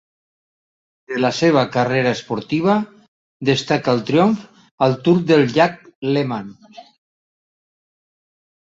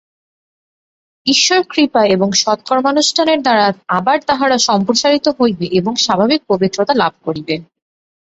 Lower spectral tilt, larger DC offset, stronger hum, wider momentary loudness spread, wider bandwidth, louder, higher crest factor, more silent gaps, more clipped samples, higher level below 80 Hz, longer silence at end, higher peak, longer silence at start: first, -6.5 dB/octave vs -3.5 dB/octave; neither; neither; first, 11 LU vs 5 LU; about the same, 7.8 kHz vs 8.4 kHz; second, -18 LUFS vs -14 LUFS; about the same, 18 dB vs 14 dB; first, 3.08-3.40 s, 4.71-4.78 s, 5.95-6.02 s vs none; neither; about the same, -60 dBFS vs -56 dBFS; first, 1.9 s vs 0.65 s; about the same, -2 dBFS vs 0 dBFS; second, 1.1 s vs 1.25 s